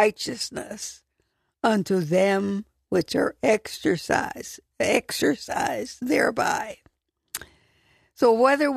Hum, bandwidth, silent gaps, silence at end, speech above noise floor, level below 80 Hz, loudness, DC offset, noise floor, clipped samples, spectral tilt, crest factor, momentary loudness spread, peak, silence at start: none; 14 kHz; none; 0 s; 50 dB; -60 dBFS; -24 LUFS; under 0.1%; -73 dBFS; under 0.1%; -4.5 dB/octave; 20 dB; 15 LU; -4 dBFS; 0 s